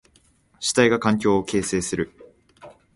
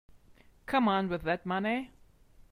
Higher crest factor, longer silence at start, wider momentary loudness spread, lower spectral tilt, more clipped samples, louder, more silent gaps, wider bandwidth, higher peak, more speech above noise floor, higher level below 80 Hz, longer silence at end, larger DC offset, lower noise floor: about the same, 20 dB vs 18 dB; about the same, 0.6 s vs 0.7 s; second, 10 LU vs 15 LU; second, -4 dB/octave vs -7 dB/octave; neither; first, -22 LUFS vs -31 LUFS; neither; second, 11.5 kHz vs 14.5 kHz; first, -4 dBFS vs -16 dBFS; first, 39 dB vs 30 dB; first, -52 dBFS vs -58 dBFS; second, 0.25 s vs 0.65 s; neither; about the same, -59 dBFS vs -60 dBFS